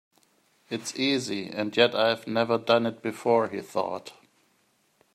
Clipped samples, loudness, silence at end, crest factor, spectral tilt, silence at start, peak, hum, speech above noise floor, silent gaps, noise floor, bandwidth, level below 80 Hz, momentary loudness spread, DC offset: under 0.1%; -26 LUFS; 1 s; 24 dB; -4 dB/octave; 0.7 s; -4 dBFS; none; 42 dB; none; -68 dBFS; 14 kHz; -76 dBFS; 11 LU; under 0.1%